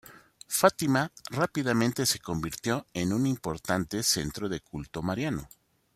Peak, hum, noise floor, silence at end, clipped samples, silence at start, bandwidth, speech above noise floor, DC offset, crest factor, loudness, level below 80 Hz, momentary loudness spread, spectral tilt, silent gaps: -6 dBFS; none; -49 dBFS; 0.5 s; under 0.1%; 0.05 s; 16 kHz; 20 dB; under 0.1%; 24 dB; -29 LUFS; -56 dBFS; 10 LU; -4 dB/octave; none